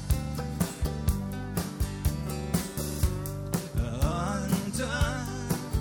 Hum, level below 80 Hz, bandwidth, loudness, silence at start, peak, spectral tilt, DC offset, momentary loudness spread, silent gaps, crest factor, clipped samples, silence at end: none; -34 dBFS; over 20 kHz; -31 LUFS; 0 s; -10 dBFS; -5.5 dB/octave; under 0.1%; 5 LU; none; 20 dB; under 0.1%; 0 s